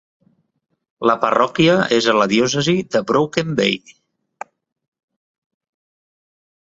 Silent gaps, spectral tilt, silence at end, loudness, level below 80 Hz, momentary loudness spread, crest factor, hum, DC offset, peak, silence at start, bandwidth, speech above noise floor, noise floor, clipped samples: none; -4.5 dB/octave; 2.95 s; -17 LUFS; -58 dBFS; 18 LU; 18 dB; none; under 0.1%; -2 dBFS; 1 s; 8 kHz; 22 dB; -38 dBFS; under 0.1%